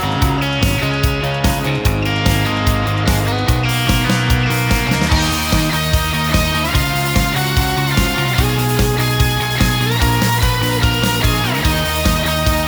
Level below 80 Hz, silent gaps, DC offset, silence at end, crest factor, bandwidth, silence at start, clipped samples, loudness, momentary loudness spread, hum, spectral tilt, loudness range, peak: -22 dBFS; none; under 0.1%; 0 s; 14 dB; over 20 kHz; 0 s; under 0.1%; -15 LUFS; 2 LU; none; -4.5 dB/octave; 1 LU; -2 dBFS